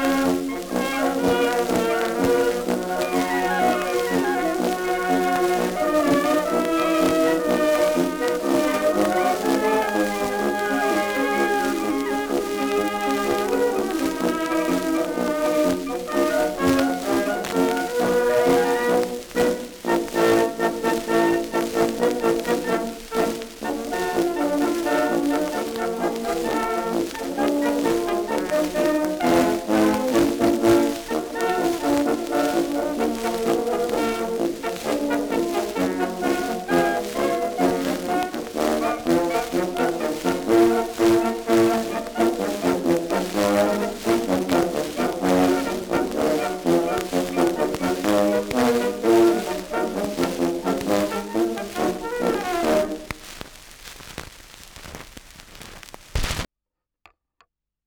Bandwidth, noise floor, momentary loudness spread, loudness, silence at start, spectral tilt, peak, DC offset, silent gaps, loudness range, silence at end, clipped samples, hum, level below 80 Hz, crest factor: over 20 kHz; -85 dBFS; 7 LU; -22 LUFS; 0 s; -4.5 dB/octave; -4 dBFS; under 0.1%; none; 3 LU; 1.4 s; under 0.1%; none; -46 dBFS; 18 dB